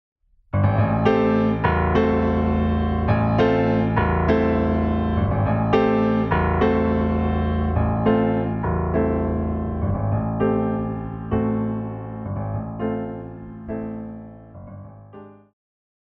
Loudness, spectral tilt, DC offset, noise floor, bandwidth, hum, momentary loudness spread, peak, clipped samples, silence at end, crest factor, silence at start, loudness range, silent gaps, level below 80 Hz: -21 LUFS; -10 dB/octave; under 0.1%; -43 dBFS; 6 kHz; none; 13 LU; -4 dBFS; under 0.1%; 0.75 s; 16 dB; 0.55 s; 10 LU; none; -32 dBFS